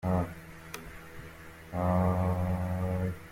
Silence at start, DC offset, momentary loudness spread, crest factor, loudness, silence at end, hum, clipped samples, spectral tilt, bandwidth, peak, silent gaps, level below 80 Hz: 0.05 s; under 0.1%; 19 LU; 16 dB; -31 LUFS; 0 s; none; under 0.1%; -8 dB/octave; 16 kHz; -16 dBFS; none; -52 dBFS